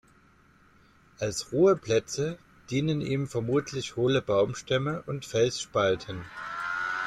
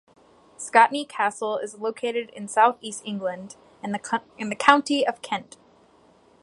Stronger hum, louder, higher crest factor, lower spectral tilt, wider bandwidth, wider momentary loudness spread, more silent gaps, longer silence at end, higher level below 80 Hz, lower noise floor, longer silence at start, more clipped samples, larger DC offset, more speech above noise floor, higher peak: neither; second, -28 LUFS vs -24 LUFS; second, 16 dB vs 24 dB; first, -5 dB/octave vs -3 dB/octave; first, 13.5 kHz vs 11.5 kHz; second, 11 LU vs 14 LU; neither; second, 0 s vs 1 s; first, -60 dBFS vs -68 dBFS; about the same, -60 dBFS vs -57 dBFS; first, 1.2 s vs 0.6 s; neither; neither; about the same, 33 dB vs 33 dB; second, -12 dBFS vs 0 dBFS